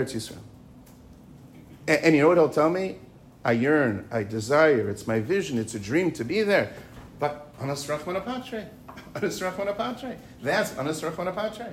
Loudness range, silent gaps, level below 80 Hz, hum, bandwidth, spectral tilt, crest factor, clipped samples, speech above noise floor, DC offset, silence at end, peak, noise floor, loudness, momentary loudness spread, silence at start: 8 LU; none; -58 dBFS; none; 16 kHz; -5.5 dB/octave; 20 dB; under 0.1%; 24 dB; under 0.1%; 0 s; -6 dBFS; -49 dBFS; -25 LUFS; 17 LU; 0 s